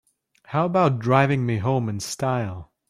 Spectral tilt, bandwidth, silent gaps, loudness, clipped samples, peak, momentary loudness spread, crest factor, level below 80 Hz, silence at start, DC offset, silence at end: -6.5 dB/octave; 14.5 kHz; none; -23 LUFS; under 0.1%; -4 dBFS; 9 LU; 18 dB; -58 dBFS; 0.5 s; under 0.1%; 0.25 s